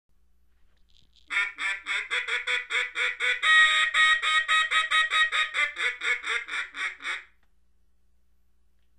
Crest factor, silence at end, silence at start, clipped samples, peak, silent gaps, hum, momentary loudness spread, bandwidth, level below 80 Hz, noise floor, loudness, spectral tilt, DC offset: 18 dB; 1.75 s; 1.3 s; under 0.1%; -8 dBFS; none; none; 11 LU; 11 kHz; -64 dBFS; -69 dBFS; -24 LUFS; 2.5 dB/octave; under 0.1%